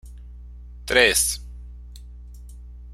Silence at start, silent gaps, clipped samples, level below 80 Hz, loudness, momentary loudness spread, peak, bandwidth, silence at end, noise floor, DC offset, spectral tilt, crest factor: 0.05 s; none; under 0.1%; -38 dBFS; -19 LUFS; 27 LU; -2 dBFS; 16 kHz; 0 s; -40 dBFS; under 0.1%; -1 dB/octave; 24 dB